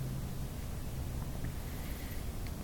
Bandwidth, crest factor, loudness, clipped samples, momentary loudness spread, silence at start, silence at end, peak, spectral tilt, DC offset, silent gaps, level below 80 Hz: 17 kHz; 14 dB; -42 LUFS; under 0.1%; 2 LU; 0 s; 0 s; -24 dBFS; -5.5 dB/octave; under 0.1%; none; -42 dBFS